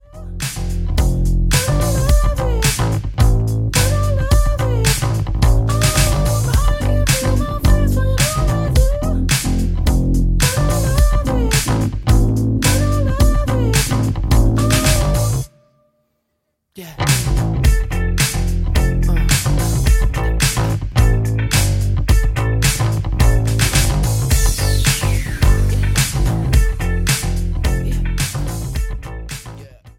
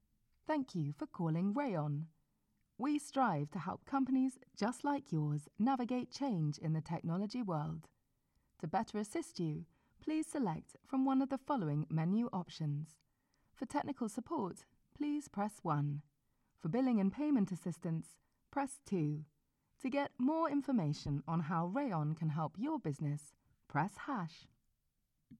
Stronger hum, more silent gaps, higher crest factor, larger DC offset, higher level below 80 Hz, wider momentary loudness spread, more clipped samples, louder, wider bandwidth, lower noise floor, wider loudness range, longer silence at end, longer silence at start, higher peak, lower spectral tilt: neither; neither; about the same, 14 dB vs 16 dB; neither; first, -18 dBFS vs -72 dBFS; second, 5 LU vs 10 LU; neither; first, -17 LUFS vs -39 LUFS; first, 17 kHz vs 12.5 kHz; second, -71 dBFS vs -82 dBFS; about the same, 3 LU vs 4 LU; about the same, 0.1 s vs 0.05 s; second, 0.15 s vs 0.5 s; first, 0 dBFS vs -22 dBFS; second, -4.5 dB/octave vs -7.5 dB/octave